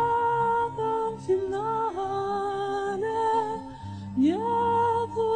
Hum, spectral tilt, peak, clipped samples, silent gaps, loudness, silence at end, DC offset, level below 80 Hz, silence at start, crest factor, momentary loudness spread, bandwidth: 50 Hz at -55 dBFS; -7 dB/octave; -14 dBFS; under 0.1%; none; -27 LUFS; 0 s; 0.1%; -60 dBFS; 0 s; 12 dB; 6 LU; 9.6 kHz